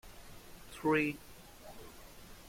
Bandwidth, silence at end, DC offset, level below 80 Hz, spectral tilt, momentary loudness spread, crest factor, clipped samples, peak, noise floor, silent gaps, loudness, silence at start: 16.5 kHz; 0.1 s; under 0.1%; -60 dBFS; -5.5 dB/octave; 23 LU; 22 dB; under 0.1%; -18 dBFS; -53 dBFS; none; -34 LUFS; 0.05 s